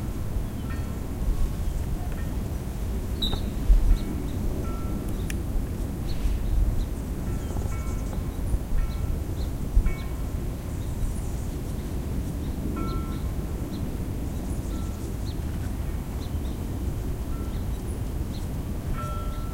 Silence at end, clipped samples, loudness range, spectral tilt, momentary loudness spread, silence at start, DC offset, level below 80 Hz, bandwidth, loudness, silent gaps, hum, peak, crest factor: 0 s; under 0.1%; 3 LU; -6.5 dB/octave; 5 LU; 0 s; under 0.1%; -28 dBFS; 16 kHz; -31 LUFS; none; none; -8 dBFS; 20 dB